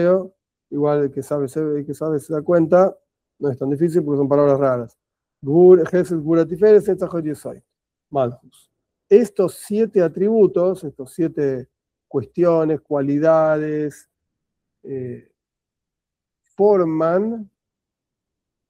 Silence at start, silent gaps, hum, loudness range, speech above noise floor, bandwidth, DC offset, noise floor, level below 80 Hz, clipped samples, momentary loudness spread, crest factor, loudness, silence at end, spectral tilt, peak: 0 s; none; none; 6 LU; 68 dB; 13 kHz; under 0.1%; -85 dBFS; -62 dBFS; under 0.1%; 16 LU; 18 dB; -18 LUFS; 1.25 s; -8.5 dB/octave; 0 dBFS